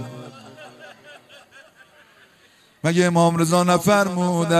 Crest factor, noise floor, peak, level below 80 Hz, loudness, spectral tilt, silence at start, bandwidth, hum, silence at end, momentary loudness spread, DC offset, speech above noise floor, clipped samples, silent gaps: 18 dB; -55 dBFS; -4 dBFS; -62 dBFS; -18 LUFS; -5.5 dB/octave; 0 s; 14 kHz; none; 0 s; 25 LU; under 0.1%; 38 dB; under 0.1%; none